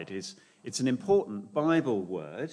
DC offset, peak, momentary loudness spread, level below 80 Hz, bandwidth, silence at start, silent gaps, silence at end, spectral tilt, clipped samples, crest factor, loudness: under 0.1%; -12 dBFS; 13 LU; -74 dBFS; 10.5 kHz; 0 s; none; 0 s; -5.5 dB/octave; under 0.1%; 16 dB; -30 LUFS